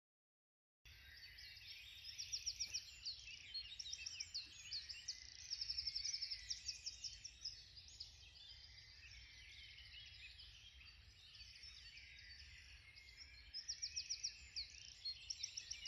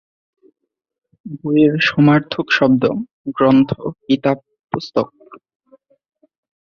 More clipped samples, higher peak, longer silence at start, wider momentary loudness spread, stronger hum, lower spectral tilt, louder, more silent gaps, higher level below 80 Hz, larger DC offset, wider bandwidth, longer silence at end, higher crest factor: neither; second, -32 dBFS vs -2 dBFS; second, 0.85 s vs 1.25 s; about the same, 15 LU vs 14 LU; neither; second, 1.5 dB/octave vs -7.5 dB/octave; second, -49 LUFS vs -16 LUFS; second, none vs 3.13-3.24 s; second, -70 dBFS vs -54 dBFS; neither; first, 14.5 kHz vs 6.8 kHz; second, 0 s vs 1.3 s; about the same, 20 dB vs 16 dB